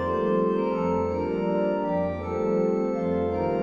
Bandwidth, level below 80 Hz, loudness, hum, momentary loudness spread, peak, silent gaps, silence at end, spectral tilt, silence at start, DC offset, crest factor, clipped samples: 7 kHz; -50 dBFS; -26 LUFS; none; 3 LU; -14 dBFS; none; 0 s; -9 dB/octave; 0 s; under 0.1%; 12 dB; under 0.1%